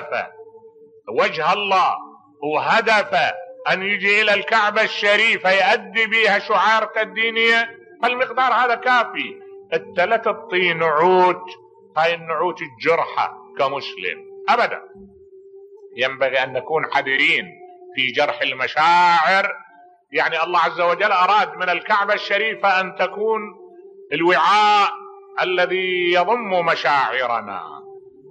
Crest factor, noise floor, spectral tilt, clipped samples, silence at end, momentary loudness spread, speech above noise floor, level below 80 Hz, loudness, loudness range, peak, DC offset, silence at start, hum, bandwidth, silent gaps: 14 dB; -49 dBFS; -3.5 dB/octave; under 0.1%; 0.2 s; 12 LU; 30 dB; -72 dBFS; -18 LUFS; 5 LU; -4 dBFS; under 0.1%; 0 s; none; 9.4 kHz; none